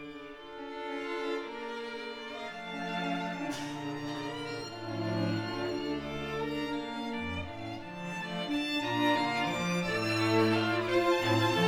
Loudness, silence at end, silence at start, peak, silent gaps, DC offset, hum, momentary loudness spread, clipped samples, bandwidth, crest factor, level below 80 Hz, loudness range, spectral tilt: -33 LUFS; 0 s; 0 s; -14 dBFS; none; under 0.1%; none; 13 LU; under 0.1%; 19.5 kHz; 20 dB; -62 dBFS; 8 LU; -5.5 dB/octave